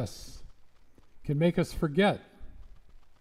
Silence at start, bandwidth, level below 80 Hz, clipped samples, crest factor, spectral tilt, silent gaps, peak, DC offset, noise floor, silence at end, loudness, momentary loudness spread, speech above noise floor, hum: 0 s; 15 kHz; -48 dBFS; under 0.1%; 20 dB; -6.5 dB/octave; none; -12 dBFS; under 0.1%; -54 dBFS; 0.05 s; -29 LUFS; 19 LU; 26 dB; none